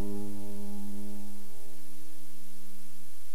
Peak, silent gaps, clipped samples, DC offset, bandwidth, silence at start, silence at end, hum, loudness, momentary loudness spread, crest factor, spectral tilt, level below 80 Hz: -18 dBFS; none; under 0.1%; 9%; 19 kHz; 0 s; 0 s; none; -46 LUFS; 10 LU; 16 dB; -6 dB/octave; -68 dBFS